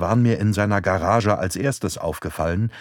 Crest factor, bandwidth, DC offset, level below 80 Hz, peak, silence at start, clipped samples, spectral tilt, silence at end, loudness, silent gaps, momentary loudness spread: 16 dB; 18 kHz; under 0.1%; -42 dBFS; -4 dBFS; 0 s; under 0.1%; -6.5 dB/octave; 0 s; -21 LUFS; none; 7 LU